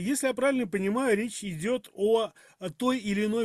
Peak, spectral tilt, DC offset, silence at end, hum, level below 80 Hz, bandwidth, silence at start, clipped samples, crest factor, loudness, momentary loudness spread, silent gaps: -12 dBFS; -4.5 dB/octave; under 0.1%; 0 s; none; -64 dBFS; 14.5 kHz; 0 s; under 0.1%; 16 dB; -28 LUFS; 8 LU; none